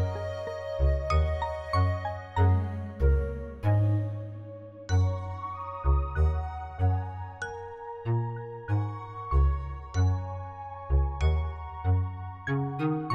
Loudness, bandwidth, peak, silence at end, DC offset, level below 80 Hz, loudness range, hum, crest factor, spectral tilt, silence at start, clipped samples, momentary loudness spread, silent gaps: -30 LUFS; 7.4 kHz; -12 dBFS; 0 s; under 0.1%; -32 dBFS; 3 LU; none; 16 dB; -8 dB/octave; 0 s; under 0.1%; 11 LU; none